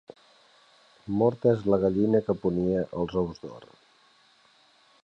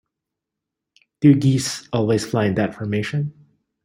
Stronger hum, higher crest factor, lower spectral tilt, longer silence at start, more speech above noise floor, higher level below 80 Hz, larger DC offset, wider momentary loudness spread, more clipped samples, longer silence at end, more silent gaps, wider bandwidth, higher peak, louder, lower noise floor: neither; about the same, 18 dB vs 18 dB; first, -9.5 dB/octave vs -6 dB/octave; second, 1.05 s vs 1.2 s; second, 36 dB vs 65 dB; about the same, -54 dBFS vs -56 dBFS; neither; first, 13 LU vs 10 LU; neither; first, 1.4 s vs 0.55 s; neither; second, 7.2 kHz vs 16 kHz; second, -10 dBFS vs -2 dBFS; second, -26 LUFS vs -20 LUFS; second, -61 dBFS vs -83 dBFS